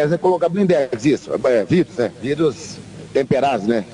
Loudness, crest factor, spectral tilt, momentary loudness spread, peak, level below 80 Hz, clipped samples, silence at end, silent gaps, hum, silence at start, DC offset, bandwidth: -18 LUFS; 14 dB; -6.5 dB/octave; 7 LU; -4 dBFS; -54 dBFS; under 0.1%; 0 s; none; none; 0 s; under 0.1%; 10.5 kHz